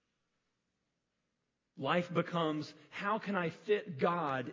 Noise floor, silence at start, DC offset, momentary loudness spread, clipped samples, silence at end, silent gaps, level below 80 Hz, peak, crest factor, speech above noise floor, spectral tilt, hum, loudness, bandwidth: -85 dBFS; 1.75 s; under 0.1%; 8 LU; under 0.1%; 0 s; none; -80 dBFS; -18 dBFS; 20 dB; 50 dB; -7 dB/octave; none; -35 LUFS; 7.6 kHz